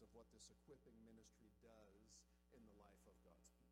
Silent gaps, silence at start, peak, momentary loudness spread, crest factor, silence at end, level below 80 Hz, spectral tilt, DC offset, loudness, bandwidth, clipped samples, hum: none; 0 s; -52 dBFS; 4 LU; 18 dB; 0 s; -78 dBFS; -4 dB/octave; under 0.1%; -68 LUFS; 13 kHz; under 0.1%; none